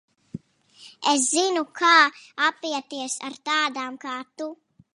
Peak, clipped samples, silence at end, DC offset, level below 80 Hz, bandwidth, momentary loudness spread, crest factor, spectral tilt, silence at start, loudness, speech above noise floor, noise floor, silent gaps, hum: -4 dBFS; under 0.1%; 0.4 s; under 0.1%; -74 dBFS; 11.5 kHz; 19 LU; 22 dB; -1 dB/octave; 0.35 s; -22 LUFS; 29 dB; -52 dBFS; none; none